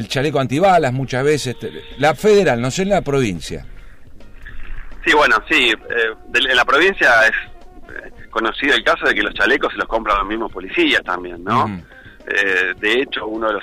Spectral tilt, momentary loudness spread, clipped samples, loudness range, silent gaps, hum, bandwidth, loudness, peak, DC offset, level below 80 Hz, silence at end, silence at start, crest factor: -4.5 dB/octave; 13 LU; under 0.1%; 4 LU; none; none; 15.5 kHz; -16 LUFS; -6 dBFS; under 0.1%; -38 dBFS; 0 s; 0 s; 12 dB